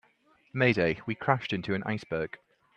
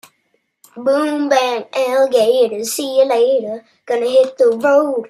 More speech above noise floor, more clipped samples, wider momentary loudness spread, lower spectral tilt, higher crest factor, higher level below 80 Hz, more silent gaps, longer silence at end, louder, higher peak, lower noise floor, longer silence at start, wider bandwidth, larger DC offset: second, 37 dB vs 50 dB; neither; first, 13 LU vs 8 LU; first, -7 dB/octave vs -3 dB/octave; first, 24 dB vs 14 dB; first, -62 dBFS vs -72 dBFS; neither; first, 0.4 s vs 0 s; second, -29 LUFS vs -15 LUFS; second, -6 dBFS vs -2 dBFS; about the same, -66 dBFS vs -65 dBFS; second, 0.55 s vs 0.75 s; second, 8.8 kHz vs 14.5 kHz; neither